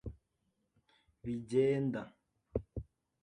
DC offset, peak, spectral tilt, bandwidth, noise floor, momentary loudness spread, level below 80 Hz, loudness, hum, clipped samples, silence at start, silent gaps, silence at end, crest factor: under 0.1%; -18 dBFS; -8 dB/octave; 10 kHz; -81 dBFS; 18 LU; -56 dBFS; -36 LUFS; none; under 0.1%; 0.05 s; none; 0.4 s; 20 dB